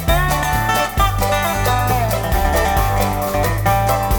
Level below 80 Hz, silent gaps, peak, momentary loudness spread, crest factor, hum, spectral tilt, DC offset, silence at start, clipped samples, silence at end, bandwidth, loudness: -22 dBFS; none; -2 dBFS; 2 LU; 14 dB; none; -4.5 dB/octave; under 0.1%; 0 s; under 0.1%; 0 s; over 20 kHz; -17 LUFS